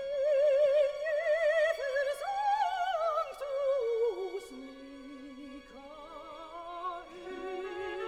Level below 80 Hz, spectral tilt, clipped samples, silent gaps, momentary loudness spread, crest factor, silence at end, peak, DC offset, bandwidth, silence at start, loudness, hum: -66 dBFS; -3 dB/octave; under 0.1%; none; 20 LU; 14 dB; 0 s; -18 dBFS; under 0.1%; 13.5 kHz; 0 s; -31 LUFS; none